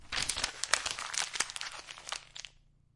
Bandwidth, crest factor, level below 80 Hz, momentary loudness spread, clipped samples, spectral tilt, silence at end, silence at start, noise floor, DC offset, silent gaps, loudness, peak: 11.5 kHz; 32 dB; -58 dBFS; 15 LU; under 0.1%; 1 dB/octave; 0.45 s; 0 s; -62 dBFS; under 0.1%; none; -34 LUFS; -6 dBFS